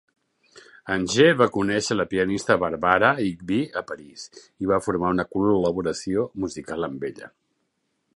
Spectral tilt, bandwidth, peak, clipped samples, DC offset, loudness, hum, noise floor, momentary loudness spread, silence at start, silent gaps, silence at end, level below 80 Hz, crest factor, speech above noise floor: -5 dB/octave; 11.5 kHz; -2 dBFS; under 0.1%; under 0.1%; -23 LUFS; none; -74 dBFS; 17 LU; 0.55 s; none; 0.9 s; -52 dBFS; 22 dB; 51 dB